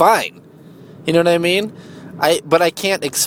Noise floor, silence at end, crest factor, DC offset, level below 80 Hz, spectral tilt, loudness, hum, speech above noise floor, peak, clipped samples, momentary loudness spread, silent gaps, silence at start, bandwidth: -40 dBFS; 0 s; 16 dB; under 0.1%; -60 dBFS; -3.5 dB/octave; -16 LUFS; none; 25 dB; 0 dBFS; under 0.1%; 14 LU; none; 0 s; 20 kHz